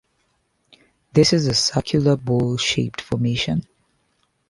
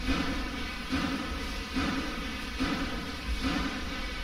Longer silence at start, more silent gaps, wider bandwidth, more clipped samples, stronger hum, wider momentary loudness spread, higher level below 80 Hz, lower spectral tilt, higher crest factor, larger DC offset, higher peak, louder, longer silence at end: first, 1.15 s vs 0 s; neither; second, 11.5 kHz vs 16 kHz; neither; neither; first, 8 LU vs 5 LU; second, -48 dBFS vs -38 dBFS; about the same, -5 dB/octave vs -4.5 dB/octave; about the same, 20 dB vs 18 dB; neither; first, -2 dBFS vs -14 dBFS; first, -20 LUFS vs -33 LUFS; first, 0.85 s vs 0 s